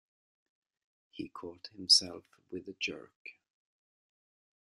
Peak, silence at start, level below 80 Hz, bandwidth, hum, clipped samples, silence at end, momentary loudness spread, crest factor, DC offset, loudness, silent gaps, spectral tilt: -10 dBFS; 1.15 s; -80 dBFS; 13 kHz; none; under 0.1%; 1.4 s; 27 LU; 28 dB; under 0.1%; -27 LUFS; 3.16-3.25 s; -0.5 dB/octave